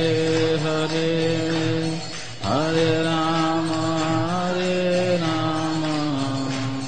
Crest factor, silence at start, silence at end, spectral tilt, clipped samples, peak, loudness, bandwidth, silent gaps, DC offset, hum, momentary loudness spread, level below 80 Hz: 14 dB; 0 s; 0 s; -5.5 dB/octave; under 0.1%; -8 dBFS; -22 LUFS; 8.8 kHz; none; 2%; none; 5 LU; -52 dBFS